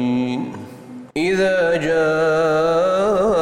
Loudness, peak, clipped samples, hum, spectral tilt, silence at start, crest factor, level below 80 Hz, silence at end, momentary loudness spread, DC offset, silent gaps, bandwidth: -18 LUFS; -8 dBFS; under 0.1%; none; -6 dB/octave; 0 s; 10 dB; -48 dBFS; 0 s; 14 LU; under 0.1%; none; 15.5 kHz